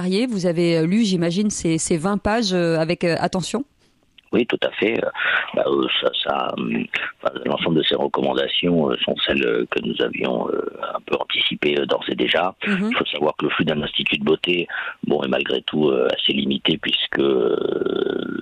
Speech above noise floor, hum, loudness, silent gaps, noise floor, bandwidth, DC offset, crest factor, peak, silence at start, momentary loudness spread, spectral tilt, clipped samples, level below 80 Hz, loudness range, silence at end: 35 dB; none; -20 LUFS; none; -56 dBFS; 12 kHz; under 0.1%; 14 dB; -6 dBFS; 0 s; 5 LU; -4.5 dB/octave; under 0.1%; -52 dBFS; 2 LU; 0 s